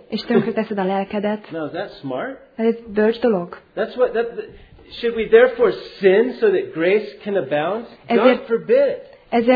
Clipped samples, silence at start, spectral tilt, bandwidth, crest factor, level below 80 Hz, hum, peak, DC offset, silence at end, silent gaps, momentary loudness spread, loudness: under 0.1%; 0.1 s; -8.5 dB/octave; 5 kHz; 18 dB; -54 dBFS; none; 0 dBFS; under 0.1%; 0 s; none; 12 LU; -19 LUFS